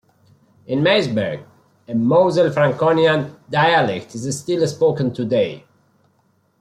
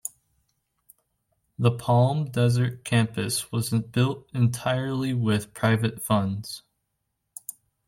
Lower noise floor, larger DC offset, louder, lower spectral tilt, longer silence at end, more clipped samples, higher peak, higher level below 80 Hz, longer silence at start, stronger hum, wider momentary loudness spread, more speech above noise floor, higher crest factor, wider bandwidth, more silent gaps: second, -62 dBFS vs -78 dBFS; neither; first, -18 LUFS vs -25 LUFS; about the same, -5.5 dB/octave vs -6 dB/octave; first, 1 s vs 0.35 s; neither; first, -2 dBFS vs -10 dBFS; about the same, -60 dBFS vs -60 dBFS; first, 0.7 s vs 0.05 s; neither; second, 11 LU vs 16 LU; second, 44 dB vs 54 dB; about the same, 16 dB vs 16 dB; second, 13 kHz vs 16.5 kHz; neither